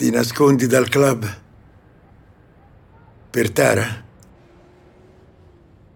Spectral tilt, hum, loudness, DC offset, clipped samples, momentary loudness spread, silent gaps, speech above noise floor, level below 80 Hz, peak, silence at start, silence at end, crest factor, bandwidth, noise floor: -5 dB/octave; none; -18 LUFS; under 0.1%; under 0.1%; 14 LU; none; 33 dB; -54 dBFS; -2 dBFS; 0 s; 1.95 s; 18 dB; 17 kHz; -49 dBFS